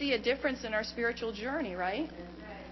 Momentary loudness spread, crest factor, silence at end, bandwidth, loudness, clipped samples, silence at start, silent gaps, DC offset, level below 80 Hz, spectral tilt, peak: 14 LU; 18 dB; 0 s; 6.2 kHz; -34 LUFS; under 0.1%; 0 s; none; under 0.1%; -56 dBFS; -4.5 dB/octave; -16 dBFS